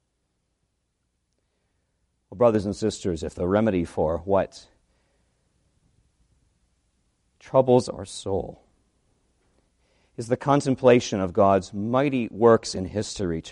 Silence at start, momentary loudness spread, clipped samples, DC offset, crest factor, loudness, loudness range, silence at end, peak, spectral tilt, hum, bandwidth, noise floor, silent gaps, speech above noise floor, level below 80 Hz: 2.3 s; 11 LU; under 0.1%; under 0.1%; 22 dB; -23 LUFS; 7 LU; 0 s; -4 dBFS; -6 dB/octave; none; 11 kHz; -75 dBFS; none; 52 dB; -52 dBFS